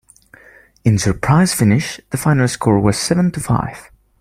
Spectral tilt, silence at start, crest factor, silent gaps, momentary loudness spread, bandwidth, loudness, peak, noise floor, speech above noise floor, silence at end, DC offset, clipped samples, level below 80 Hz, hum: -5.5 dB/octave; 0.85 s; 16 dB; none; 6 LU; 16 kHz; -16 LUFS; 0 dBFS; -47 dBFS; 32 dB; 0.4 s; under 0.1%; under 0.1%; -40 dBFS; none